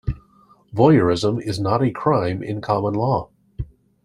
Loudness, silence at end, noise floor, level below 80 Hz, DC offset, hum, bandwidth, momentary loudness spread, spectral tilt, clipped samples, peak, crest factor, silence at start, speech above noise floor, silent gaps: -20 LUFS; 0.4 s; -54 dBFS; -42 dBFS; under 0.1%; none; 12.5 kHz; 20 LU; -7.5 dB/octave; under 0.1%; -2 dBFS; 18 dB; 0.05 s; 36 dB; none